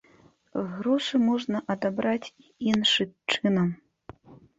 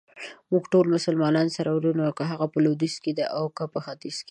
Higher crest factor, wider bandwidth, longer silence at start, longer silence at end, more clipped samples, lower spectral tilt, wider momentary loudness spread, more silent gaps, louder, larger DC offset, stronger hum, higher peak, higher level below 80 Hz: first, 22 dB vs 16 dB; second, 8 kHz vs 10.5 kHz; first, 0.55 s vs 0.15 s; about the same, 0.2 s vs 0.1 s; neither; second, -5 dB/octave vs -6.5 dB/octave; about the same, 11 LU vs 12 LU; neither; about the same, -26 LUFS vs -25 LUFS; neither; neither; first, -6 dBFS vs -10 dBFS; first, -64 dBFS vs -72 dBFS